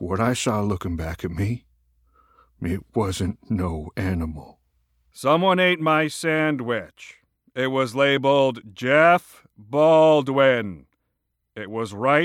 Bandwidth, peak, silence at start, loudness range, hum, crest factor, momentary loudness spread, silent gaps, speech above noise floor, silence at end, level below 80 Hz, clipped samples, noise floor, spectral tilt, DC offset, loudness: 16.5 kHz; -2 dBFS; 0 s; 10 LU; none; 20 dB; 13 LU; none; 55 dB; 0 s; -50 dBFS; under 0.1%; -76 dBFS; -5.5 dB/octave; under 0.1%; -21 LUFS